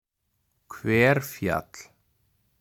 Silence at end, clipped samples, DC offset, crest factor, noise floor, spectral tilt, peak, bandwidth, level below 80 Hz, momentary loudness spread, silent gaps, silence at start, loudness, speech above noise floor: 0.8 s; under 0.1%; under 0.1%; 22 dB; -75 dBFS; -6 dB/octave; -6 dBFS; 19.5 kHz; -56 dBFS; 25 LU; none; 0.7 s; -24 LUFS; 51 dB